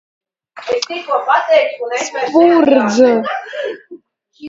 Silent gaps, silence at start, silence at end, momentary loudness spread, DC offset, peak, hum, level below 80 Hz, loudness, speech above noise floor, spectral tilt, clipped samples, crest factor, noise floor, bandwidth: none; 0.55 s; 0 s; 14 LU; under 0.1%; 0 dBFS; none; -62 dBFS; -14 LUFS; 28 dB; -4 dB/octave; under 0.1%; 14 dB; -41 dBFS; 7.8 kHz